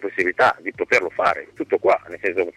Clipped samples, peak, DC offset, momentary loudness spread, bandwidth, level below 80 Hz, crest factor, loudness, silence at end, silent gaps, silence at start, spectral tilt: under 0.1%; -6 dBFS; under 0.1%; 7 LU; 13.5 kHz; -60 dBFS; 14 dB; -20 LUFS; 0.05 s; none; 0 s; -4 dB/octave